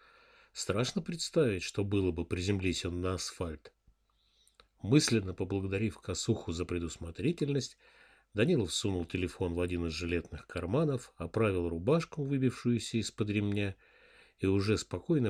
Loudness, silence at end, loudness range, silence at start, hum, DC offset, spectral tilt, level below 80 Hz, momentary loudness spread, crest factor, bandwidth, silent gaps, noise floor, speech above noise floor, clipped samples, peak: -33 LUFS; 0 s; 2 LU; 0.55 s; none; under 0.1%; -5.5 dB/octave; -54 dBFS; 9 LU; 20 dB; 14 kHz; none; -72 dBFS; 40 dB; under 0.1%; -12 dBFS